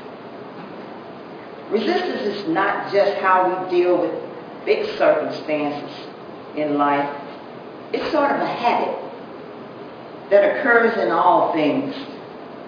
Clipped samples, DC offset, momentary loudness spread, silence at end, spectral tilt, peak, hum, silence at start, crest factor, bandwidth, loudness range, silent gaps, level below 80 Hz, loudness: under 0.1%; under 0.1%; 20 LU; 0 s; -6.5 dB/octave; -2 dBFS; none; 0 s; 20 dB; 5.2 kHz; 4 LU; none; -68 dBFS; -20 LUFS